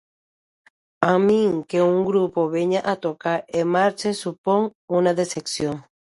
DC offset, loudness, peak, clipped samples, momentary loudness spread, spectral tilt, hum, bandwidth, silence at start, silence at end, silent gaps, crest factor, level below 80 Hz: under 0.1%; -21 LUFS; 0 dBFS; under 0.1%; 7 LU; -5.5 dB/octave; none; 11.5 kHz; 1 s; 0.3 s; 4.38-4.44 s, 4.75-4.88 s; 22 dB; -62 dBFS